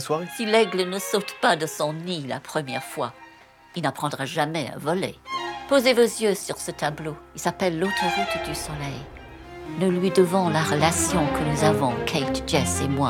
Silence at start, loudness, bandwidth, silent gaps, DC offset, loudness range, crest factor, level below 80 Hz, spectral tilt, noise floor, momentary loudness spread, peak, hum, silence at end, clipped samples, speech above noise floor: 0 s; -24 LUFS; 18.5 kHz; none; under 0.1%; 6 LU; 22 dB; -48 dBFS; -4.5 dB/octave; -50 dBFS; 11 LU; -2 dBFS; none; 0 s; under 0.1%; 26 dB